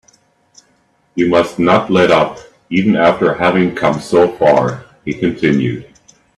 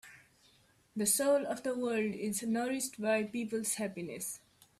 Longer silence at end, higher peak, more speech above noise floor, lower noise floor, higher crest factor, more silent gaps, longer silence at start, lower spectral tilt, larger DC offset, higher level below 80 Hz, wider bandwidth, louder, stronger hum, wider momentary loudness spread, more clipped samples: first, 0.55 s vs 0.4 s; first, 0 dBFS vs -14 dBFS; first, 44 dB vs 33 dB; second, -57 dBFS vs -67 dBFS; second, 14 dB vs 20 dB; neither; first, 1.15 s vs 0.05 s; first, -6.5 dB/octave vs -3.5 dB/octave; neither; first, -48 dBFS vs -76 dBFS; second, 12 kHz vs 15.5 kHz; first, -13 LUFS vs -34 LUFS; neither; about the same, 10 LU vs 11 LU; neither